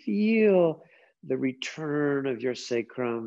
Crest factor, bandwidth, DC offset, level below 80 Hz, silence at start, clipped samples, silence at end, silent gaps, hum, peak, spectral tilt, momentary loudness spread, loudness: 14 dB; 8 kHz; under 0.1%; -78 dBFS; 0.05 s; under 0.1%; 0 s; none; none; -12 dBFS; -6 dB/octave; 11 LU; -27 LUFS